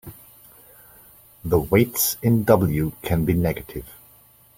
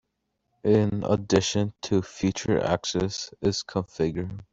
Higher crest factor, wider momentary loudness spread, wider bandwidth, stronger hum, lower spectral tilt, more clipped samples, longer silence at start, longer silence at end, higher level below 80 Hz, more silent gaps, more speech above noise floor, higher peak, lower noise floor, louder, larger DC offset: about the same, 22 dB vs 18 dB; first, 18 LU vs 7 LU; first, 16.5 kHz vs 8 kHz; neither; about the same, -6 dB/octave vs -5.5 dB/octave; neither; second, 0.05 s vs 0.65 s; first, 0.65 s vs 0.1 s; first, -42 dBFS vs -52 dBFS; neither; second, 33 dB vs 52 dB; first, -2 dBFS vs -8 dBFS; second, -53 dBFS vs -78 dBFS; first, -21 LUFS vs -26 LUFS; neither